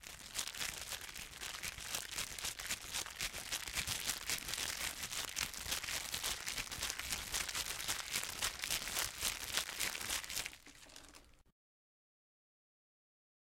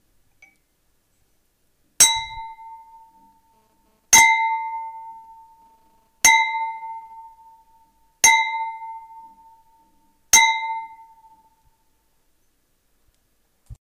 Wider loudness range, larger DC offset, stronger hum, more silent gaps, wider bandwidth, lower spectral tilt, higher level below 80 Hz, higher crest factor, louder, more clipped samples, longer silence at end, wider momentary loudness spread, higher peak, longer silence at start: about the same, 5 LU vs 5 LU; neither; neither; neither; about the same, 17 kHz vs 15.5 kHz; first, 0 dB/octave vs 2.5 dB/octave; about the same, -60 dBFS vs -56 dBFS; first, 28 dB vs 22 dB; second, -39 LUFS vs -16 LUFS; neither; first, 2.15 s vs 0.25 s; second, 7 LU vs 25 LU; second, -16 dBFS vs -2 dBFS; second, 0 s vs 2 s